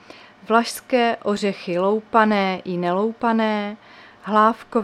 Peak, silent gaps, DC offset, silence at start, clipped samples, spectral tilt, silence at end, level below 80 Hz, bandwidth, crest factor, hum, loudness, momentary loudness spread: -2 dBFS; none; under 0.1%; 0.5 s; under 0.1%; -5.5 dB/octave; 0 s; -66 dBFS; 14 kHz; 20 dB; none; -20 LUFS; 7 LU